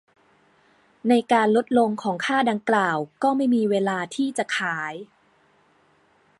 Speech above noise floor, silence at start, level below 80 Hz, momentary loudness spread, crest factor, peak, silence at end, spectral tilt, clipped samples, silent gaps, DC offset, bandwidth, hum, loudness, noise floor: 39 dB; 1.05 s; -72 dBFS; 8 LU; 18 dB; -6 dBFS; 1.35 s; -5 dB/octave; under 0.1%; none; under 0.1%; 11.5 kHz; none; -22 LUFS; -61 dBFS